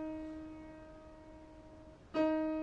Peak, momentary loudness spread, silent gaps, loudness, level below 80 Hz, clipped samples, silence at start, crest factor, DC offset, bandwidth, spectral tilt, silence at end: -22 dBFS; 22 LU; none; -38 LUFS; -62 dBFS; under 0.1%; 0 s; 18 dB; under 0.1%; 7.2 kHz; -7 dB/octave; 0 s